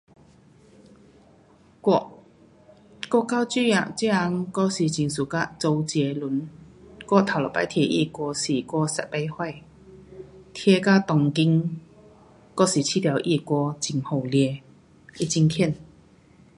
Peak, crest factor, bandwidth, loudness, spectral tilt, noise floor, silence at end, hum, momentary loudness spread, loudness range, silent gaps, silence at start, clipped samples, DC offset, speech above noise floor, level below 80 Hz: -4 dBFS; 22 dB; 11.5 kHz; -24 LUFS; -5.5 dB/octave; -55 dBFS; 0.75 s; none; 14 LU; 3 LU; none; 1.85 s; under 0.1%; under 0.1%; 32 dB; -60 dBFS